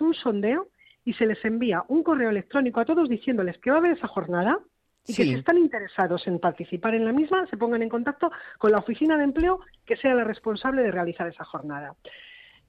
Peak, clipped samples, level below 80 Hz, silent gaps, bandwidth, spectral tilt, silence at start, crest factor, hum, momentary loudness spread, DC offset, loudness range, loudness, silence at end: -10 dBFS; under 0.1%; -54 dBFS; none; 9 kHz; -7 dB/octave; 0 s; 14 dB; none; 11 LU; under 0.1%; 1 LU; -25 LUFS; 0.4 s